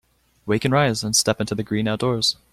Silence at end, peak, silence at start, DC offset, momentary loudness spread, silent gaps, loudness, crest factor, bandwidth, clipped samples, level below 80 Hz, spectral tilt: 0.2 s; -4 dBFS; 0.45 s; under 0.1%; 6 LU; none; -21 LUFS; 18 dB; 15.5 kHz; under 0.1%; -52 dBFS; -4 dB/octave